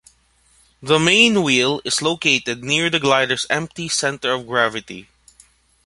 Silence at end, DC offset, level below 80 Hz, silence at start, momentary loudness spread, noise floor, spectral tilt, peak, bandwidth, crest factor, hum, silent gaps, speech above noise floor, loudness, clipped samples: 0.85 s; under 0.1%; -56 dBFS; 0.8 s; 10 LU; -58 dBFS; -3 dB/octave; -2 dBFS; 11.5 kHz; 18 dB; none; none; 39 dB; -17 LUFS; under 0.1%